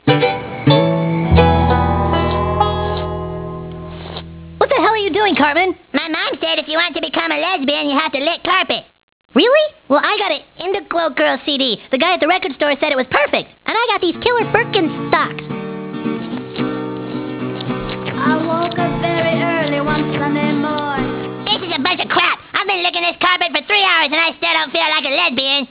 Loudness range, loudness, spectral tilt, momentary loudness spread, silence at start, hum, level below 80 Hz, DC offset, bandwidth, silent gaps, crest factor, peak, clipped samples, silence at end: 5 LU; -16 LUFS; -9 dB/octave; 11 LU; 0.05 s; none; -32 dBFS; under 0.1%; 4 kHz; 9.03-9.29 s; 16 dB; 0 dBFS; under 0.1%; 0.05 s